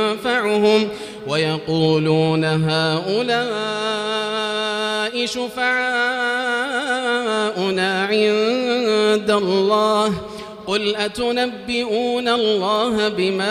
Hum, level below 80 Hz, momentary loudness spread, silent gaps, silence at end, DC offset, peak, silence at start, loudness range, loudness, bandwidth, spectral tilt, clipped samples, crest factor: none; -56 dBFS; 5 LU; none; 0 s; under 0.1%; -2 dBFS; 0 s; 2 LU; -19 LUFS; 14 kHz; -5 dB/octave; under 0.1%; 16 dB